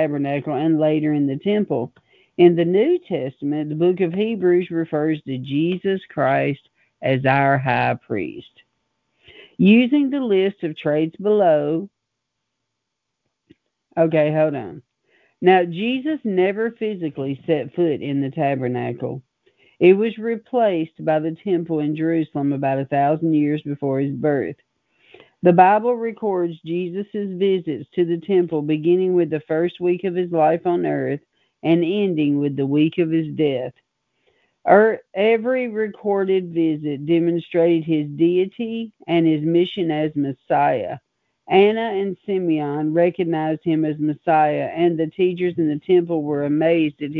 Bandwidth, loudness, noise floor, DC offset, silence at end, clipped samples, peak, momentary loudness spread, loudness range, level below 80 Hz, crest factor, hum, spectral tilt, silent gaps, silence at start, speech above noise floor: 4.5 kHz; -20 LUFS; -79 dBFS; under 0.1%; 0 s; under 0.1%; -2 dBFS; 10 LU; 3 LU; -66 dBFS; 18 dB; none; -10 dB/octave; none; 0 s; 60 dB